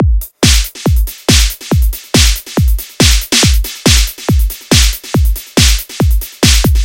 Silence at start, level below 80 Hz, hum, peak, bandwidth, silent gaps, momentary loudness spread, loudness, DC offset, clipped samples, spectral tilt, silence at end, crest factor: 0 s; -14 dBFS; none; 0 dBFS; 17 kHz; none; 5 LU; -11 LUFS; under 0.1%; 0.4%; -3.5 dB/octave; 0 s; 10 dB